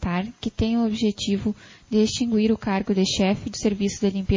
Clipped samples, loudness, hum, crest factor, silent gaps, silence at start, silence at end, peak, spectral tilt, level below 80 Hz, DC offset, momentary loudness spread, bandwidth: under 0.1%; -23 LUFS; none; 14 dB; none; 0 s; 0 s; -8 dBFS; -5.5 dB/octave; -40 dBFS; under 0.1%; 6 LU; 7.6 kHz